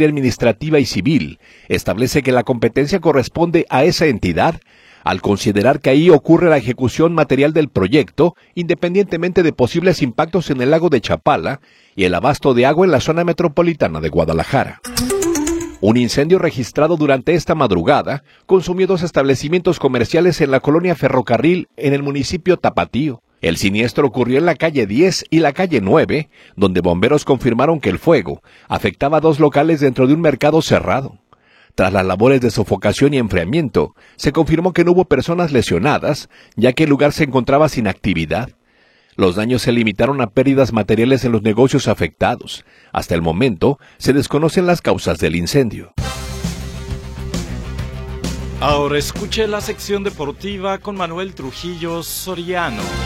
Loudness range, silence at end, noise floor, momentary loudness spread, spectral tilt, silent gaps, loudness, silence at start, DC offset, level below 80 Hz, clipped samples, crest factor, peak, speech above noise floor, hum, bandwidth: 6 LU; 0 s; -54 dBFS; 11 LU; -6 dB/octave; none; -16 LUFS; 0 s; under 0.1%; -38 dBFS; under 0.1%; 14 dB; 0 dBFS; 39 dB; none; 16 kHz